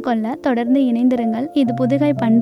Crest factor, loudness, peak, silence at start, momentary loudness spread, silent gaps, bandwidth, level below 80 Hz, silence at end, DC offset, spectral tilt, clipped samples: 12 dB; -17 LUFS; -6 dBFS; 0 s; 4 LU; none; 10 kHz; -60 dBFS; 0 s; under 0.1%; -8.5 dB/octave; under 0.1%